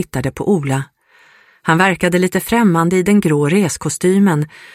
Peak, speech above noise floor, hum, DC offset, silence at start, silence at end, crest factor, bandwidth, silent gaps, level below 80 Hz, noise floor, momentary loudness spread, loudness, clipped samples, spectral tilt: 0 dBFS; 35 dB; none; under 0.1%; 0 s; 0.25 s; 16 dB; 16 kHz; none; -46 dBFS; -49 dBFS; 8 LU; -15 LUFS; under 0.1%; -6 dB/octave